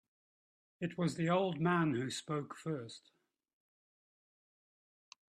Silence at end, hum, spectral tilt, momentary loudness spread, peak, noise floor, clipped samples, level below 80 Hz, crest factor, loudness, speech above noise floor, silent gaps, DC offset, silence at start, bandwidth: 2.3 s; none; -6 dB/octave; 11 LU; -20 dBFS; under -90 dBFS; under 0.1%; -78 dBFS; 20 dB; -36 LUFS; over 54 dB; none; under 0.1%; 0.8 s; 12 kHz